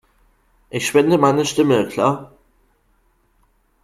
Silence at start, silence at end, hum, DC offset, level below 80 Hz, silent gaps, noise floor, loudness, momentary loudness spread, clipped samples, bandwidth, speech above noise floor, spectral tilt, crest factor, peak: 0.75 s; 1.6 s; none; under 0.1%; -56 dBFS; none; -61 dBFS; -17 LUFS; 11 LU; under 0.1%; 14.5 kHz; 44 dB; -5 dB/octave; 18 dB; -2 dBFS